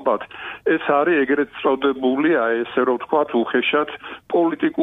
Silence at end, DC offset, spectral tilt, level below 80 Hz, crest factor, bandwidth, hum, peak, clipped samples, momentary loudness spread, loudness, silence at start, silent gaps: 0 s; under 0.1%; -7.5 dB/octave; -62 dBFS; 14 dB; 3.9 kHz; none; -4 dBFS; under 0.1%; 7 LU; -20 LUFS; 0 s; none